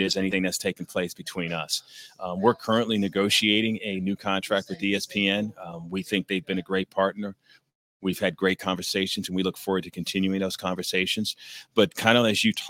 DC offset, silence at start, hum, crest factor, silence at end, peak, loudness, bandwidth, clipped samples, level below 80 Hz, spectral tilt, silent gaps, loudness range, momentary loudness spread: under 0.1%; 0 s; none; 24 dB; 0 s; -2 dBFS; -26 LUFS; 17 kHz; under 0.1%; -64 dBFS; -4 dB/octave; 7.75-8.00 s; 4 LU; 11 LU